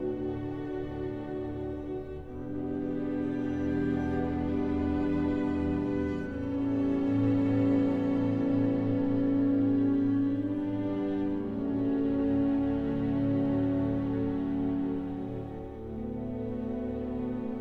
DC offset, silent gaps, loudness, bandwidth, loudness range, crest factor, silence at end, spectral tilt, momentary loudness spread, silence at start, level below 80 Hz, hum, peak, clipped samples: under 0.1%; none; -30 LUFS; 4.7 kHz; 6 LU; 14 dB; 0 s; -10 dB/octave; 10 LU; 0 s; -48 dBFS; none; -16 dBFS; under 0.1%